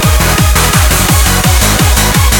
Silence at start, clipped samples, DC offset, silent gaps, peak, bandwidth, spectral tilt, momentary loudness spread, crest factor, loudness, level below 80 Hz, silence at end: 0 s; 0.3%; under 0.1%; none; 0 dBFS; 18.5 kHz; -3.5 dB/octave; 0 LU; 8 dB; -8 LUFS; -12 dBFS; 0 s